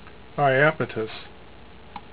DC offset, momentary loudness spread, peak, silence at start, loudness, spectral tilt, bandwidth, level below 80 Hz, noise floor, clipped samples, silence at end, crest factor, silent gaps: 0.6%; 24 LU; -4 dBFS; 0.05 s; -23 LUFS; -9.5 dB/octave; 4 kHz; -54 dBFS; -47 dBFS; under 0.1%; 0.15 s; 22 dB; none